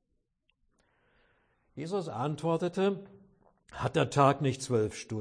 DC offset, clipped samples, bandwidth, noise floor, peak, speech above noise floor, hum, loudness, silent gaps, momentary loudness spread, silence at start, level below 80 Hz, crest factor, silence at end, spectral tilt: under 0.1%; under 0.1%; 10.5 kHz; -77 dBFS; -10 dBFS; 47 dB; none; -30 LUFS; none; 16 LU; 1.75 s; -64 dBFS; 22 dB; 0 s; -6 dB/octave